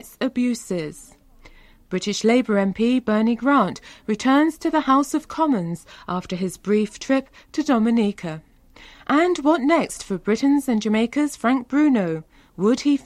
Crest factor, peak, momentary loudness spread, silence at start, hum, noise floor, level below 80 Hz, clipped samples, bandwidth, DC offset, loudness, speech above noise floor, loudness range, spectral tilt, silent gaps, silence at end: 16 dB; -6 dBFS; 11 LU; 0.05 s; none; -48 dBFS; -54 dBFS; under 0.1%; 14 kHz; under 0.1%; -21 LUFS; 28 dB; 3 LU; -5.5 dB/octave; none; 0.1 s